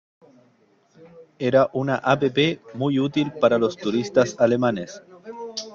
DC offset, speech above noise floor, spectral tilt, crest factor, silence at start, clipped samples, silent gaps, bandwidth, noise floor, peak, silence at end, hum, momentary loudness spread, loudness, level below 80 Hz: under 0.1%; 39 dB; -6 dB/octave; 18 dB; 1.15 s; under 0.1%; none; 7.4 kHz; -60 dBFS; -4 dBFS; 0 s; none; 13 LU; -22 LUFS; -62 dBFS